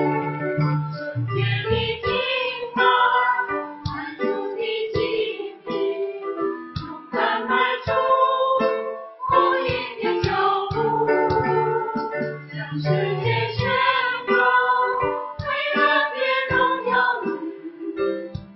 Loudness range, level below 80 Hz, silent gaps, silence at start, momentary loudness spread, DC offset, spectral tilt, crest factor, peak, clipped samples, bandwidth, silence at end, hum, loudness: 4 LU; -48 dBFS; none; 0 s; 11 LU; under 0.1%; -7.5 dB/octave; 18 dB; -4 dBFS; under 0.1%; 6 kHz; 0 s; none; -22 LUFS